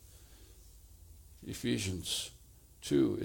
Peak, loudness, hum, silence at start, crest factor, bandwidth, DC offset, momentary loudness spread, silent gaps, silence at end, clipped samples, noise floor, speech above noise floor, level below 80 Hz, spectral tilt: -18 dBFS; -35 LUFS; none; 0.05 s; 20 dB; 19 kHz; under 0.1%; 26 LU; none; 0 s; under 0.1%; -56 dBFS; 23 dB; -58 dBFS; -4.5 dB/octave